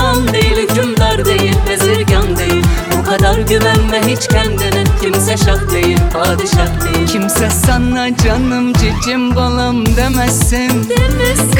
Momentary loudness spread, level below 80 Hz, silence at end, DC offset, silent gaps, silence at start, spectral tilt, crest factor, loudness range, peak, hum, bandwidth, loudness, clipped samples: 2 LU; -18 dBFS; 0 s; under 0.1%; none; 0 s; -4.5 dB/octave; 12 dB; 1 LU; 0 dBFS; none; 19.5 kHz; -12 LUFS; under 0.1%